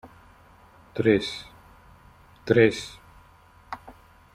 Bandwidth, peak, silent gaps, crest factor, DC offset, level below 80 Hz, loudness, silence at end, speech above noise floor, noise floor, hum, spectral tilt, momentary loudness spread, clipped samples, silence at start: 13.5 kHz; -4 dBFS; none; 24 dB; under 0.1%; -56 dBFS; -23 LUFS; 0.45 s; 32 dB; -54 dBFS; none; -6 dB/octave; 21 LU; under 0.1%; 0.05 s